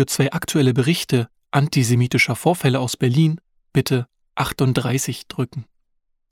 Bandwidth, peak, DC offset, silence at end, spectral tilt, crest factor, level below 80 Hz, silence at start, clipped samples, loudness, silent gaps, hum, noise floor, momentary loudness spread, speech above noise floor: 16.5 kHz; -2 dBFS; under 0.1%; 0.7 s; -5.5 dB/octave; 18 dB; -52 dBFS; 0 s; under 0.1%; -20 LUFS; none; none; -69 dBFS; 10 LU; 50 dB